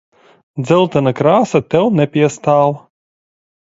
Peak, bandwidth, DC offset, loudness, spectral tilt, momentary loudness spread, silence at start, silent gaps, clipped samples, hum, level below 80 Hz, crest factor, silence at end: 0 dBFS; 8 kHz; under 0.1%; -14 LUFS; -7 dB/octave; 9 LU; 0.55 s; none; under 0.1%; none; -54 dBFS; 14 dB; 0.9 s